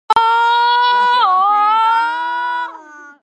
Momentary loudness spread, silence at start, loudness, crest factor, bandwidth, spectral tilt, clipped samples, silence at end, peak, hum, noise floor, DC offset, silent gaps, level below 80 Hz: 8 LU; 0.1 s; -13 LUFS; 12 dB; 9 kHz; -1 dB/octave; under 0.1%; 0.1 s; -2 dBFS; none; -37 dBFS; under 0.1%; none; -60 dBFS